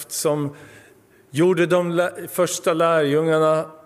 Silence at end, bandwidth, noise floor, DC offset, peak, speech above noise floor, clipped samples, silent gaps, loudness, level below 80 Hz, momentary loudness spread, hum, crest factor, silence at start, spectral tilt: 0.1 s; 16 kHz; -52 dBFS; under 0.1%; -6 dBFS; 32 dB; under 0.1%; none; -20 LUFS; -70 dBFS; 7 LU; none; 14 dB; 0 s; -5 dB/octave